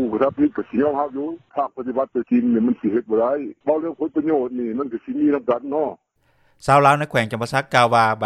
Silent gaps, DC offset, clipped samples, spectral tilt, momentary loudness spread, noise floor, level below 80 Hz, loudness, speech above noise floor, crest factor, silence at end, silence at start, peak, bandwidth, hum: none; under 0.1%; under 0.1%; -6.5 dB/octave; 10 LU; -61 dBFS; -56 dBFS; -20 LUFS; 41 dB; 18 dB; 0 s; 0 s; -2 dBFS; 13 kHz; none